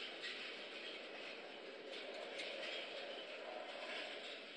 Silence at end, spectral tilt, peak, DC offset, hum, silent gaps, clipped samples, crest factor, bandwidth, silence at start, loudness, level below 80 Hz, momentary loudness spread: 0 s; -1.5 dB/octave; -36 dBFS; under 0.1%; none; none; under 0.1%; 14 dB; 10.5 kHz; 0 s; -48 LUFS; under -90 dBFS; 5 LU